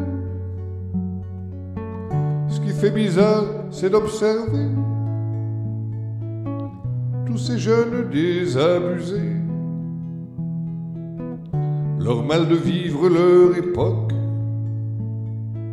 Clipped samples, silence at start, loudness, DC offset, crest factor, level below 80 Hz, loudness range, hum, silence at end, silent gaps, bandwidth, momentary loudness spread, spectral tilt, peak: under 0.1%; 0 s; -22 LUFS; under 0.1%; 16 dB; -50 dBFS; 6 LU; none; 0 s; none; 11.5 kHz; 13 LU; -8 dB/octave; -4 dBFS